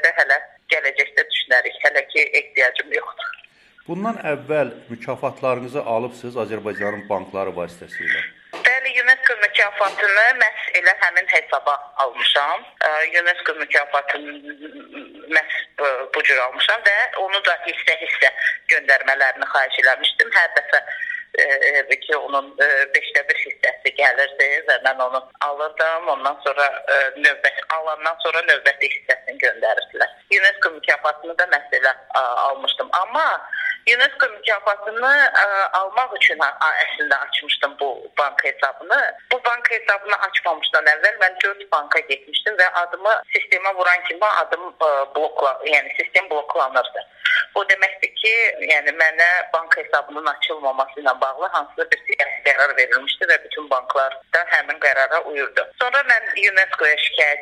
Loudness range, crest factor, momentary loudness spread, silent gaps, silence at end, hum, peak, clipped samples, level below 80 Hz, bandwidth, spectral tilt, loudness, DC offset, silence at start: 4 LU; 18 dB; 9 LU; none; 0 s; none; 0 dBFS; under 0.1%; -72 dBFS; 12.5 kHz; -2 dB/octave; -18 LUFS; under 0.1%; 0 s